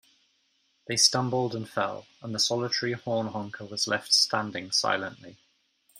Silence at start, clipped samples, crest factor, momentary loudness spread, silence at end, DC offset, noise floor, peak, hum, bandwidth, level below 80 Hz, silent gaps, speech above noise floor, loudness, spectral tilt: 0.9 s; under 0.1%; 22 dB; 13 LU; 0 s; under 0.1%; -71 dBFS; -6 dBFS; none; 16 kHz; -72 dBFS; none; 42 dB; -26 LUFS; -2.5 dB/octave